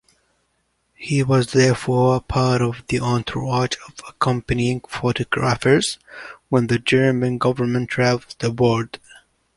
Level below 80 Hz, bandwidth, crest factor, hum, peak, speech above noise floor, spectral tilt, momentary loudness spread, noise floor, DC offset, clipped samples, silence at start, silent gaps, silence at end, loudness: -44 dBFS; 11.5 kHz; 18 dB; none; -2 dBFS; 49 dB; -6 dB/octave; 9 LU; -68 dBFS; under 0.1%; under 0.1%; 1 s; none; 0.6 s; -20 LUFS